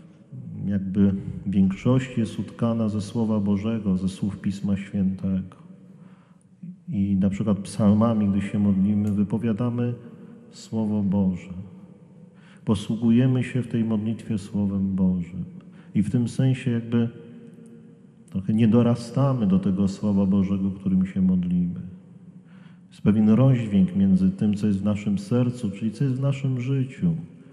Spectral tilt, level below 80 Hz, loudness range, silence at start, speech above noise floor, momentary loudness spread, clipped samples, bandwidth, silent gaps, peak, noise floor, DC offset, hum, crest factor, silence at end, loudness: -8.5 dB/octave; -56 dBFS; 5 LU; 0.3 s; 30 dB; 13 LU; under 0.1%; 10.5 kHz; none; -6 dBFS; -53 dBFS; under 0.1%; none; 16 dB; 0.25 s; -24 LUFS